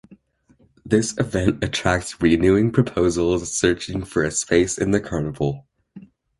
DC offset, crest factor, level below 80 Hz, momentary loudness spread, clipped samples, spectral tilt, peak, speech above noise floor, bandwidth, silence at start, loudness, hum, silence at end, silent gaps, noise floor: under 0.1%; 20 dB; -40 dBFS; 8 LU; under 0.1%; -5 dB/octave; -2 dBFS; 38 dB; 11.5 kHz; 0.1 s; -21 LUFS; none; 0.4 s; none; -58 dBFS